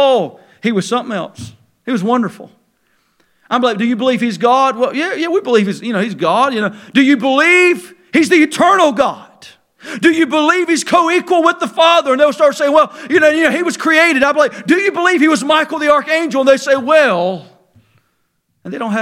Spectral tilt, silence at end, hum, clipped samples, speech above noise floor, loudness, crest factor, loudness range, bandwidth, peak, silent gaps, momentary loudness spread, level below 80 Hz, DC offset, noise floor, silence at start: -4 dB/octave; 0 s; none; under 0.1%; 52 dB; -13 LUFS; 14 dB; 5 LU; 15.5 kHz; 0 dBFS; none; 9 LU; -60 dBFS; under 0.1%; -65 dBFS; 0 s